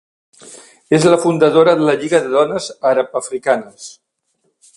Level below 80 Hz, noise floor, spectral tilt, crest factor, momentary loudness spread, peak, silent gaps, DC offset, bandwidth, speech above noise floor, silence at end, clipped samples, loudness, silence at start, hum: -60 dBFS; -66 dBFS; -5 dB/octave; 16 dB; 10 LU; 0 dBFS; none; under 0.1%; 11.5 kHz; 52 dB; 0.85 s; under 0.1%; -14 LUFS; 0.45 s; none